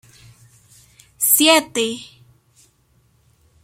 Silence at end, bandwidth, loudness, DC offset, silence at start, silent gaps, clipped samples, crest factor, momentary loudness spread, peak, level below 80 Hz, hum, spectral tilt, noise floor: 1.6 s; 16.5 kHz; -15 LUFS; under 0.1%; 1.2 s; none; under 0.1%; 22 dB; 13 LU; 0 dBFS; -62 dBFS; none; -0.5 dB/octave; -59 dBFS